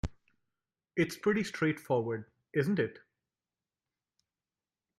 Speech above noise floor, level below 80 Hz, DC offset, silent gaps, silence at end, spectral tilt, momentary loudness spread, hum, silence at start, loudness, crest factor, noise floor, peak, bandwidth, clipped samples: over 58 dB; -56 dBFS; under 0.1%; none; 2 s; -6.5 dB/octave; 8 LU; none; 0.05 s; -33 LUFS; 20 dB; under -90 dBFS; -16 dBFS; 15 kHz; under 0.1%